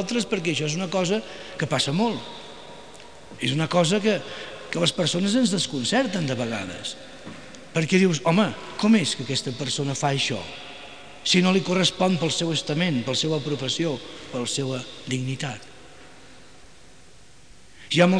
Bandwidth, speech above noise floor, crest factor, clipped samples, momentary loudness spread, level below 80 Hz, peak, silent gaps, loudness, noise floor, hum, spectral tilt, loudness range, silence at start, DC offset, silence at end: 10.5 kHz; 28 dB; 18 dB; under 0.1%; 19 LU; -60 dBFS; -6 dBFS; none; -24 LUFS; -52 dBFS; none; -4.5 dB/octave; 7 LU; 0 s; 0.4%; 0 s